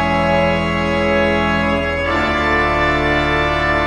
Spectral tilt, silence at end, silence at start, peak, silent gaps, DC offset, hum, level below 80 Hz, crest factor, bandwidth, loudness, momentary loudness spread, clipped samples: -6 dB/octave; 0 s; 0 s; -4 dBFS; none; under 0.1%; none; -30 dBFS; 12 dB; 11.5 kHz; -16 LUFS; 2 LU; under 0.1%